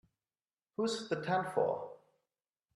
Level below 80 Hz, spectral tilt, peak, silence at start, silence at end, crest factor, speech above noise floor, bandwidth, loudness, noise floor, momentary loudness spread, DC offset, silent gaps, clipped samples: -82 dBFS; -5 dB/octave; -18 dBFS; 0.8 s; 0.8 s; 20 dB; over 56 dB; 12 kHz; -36 LUFS; under -90 dBFS; 12 LU; under 0.1%; none; under 0.1%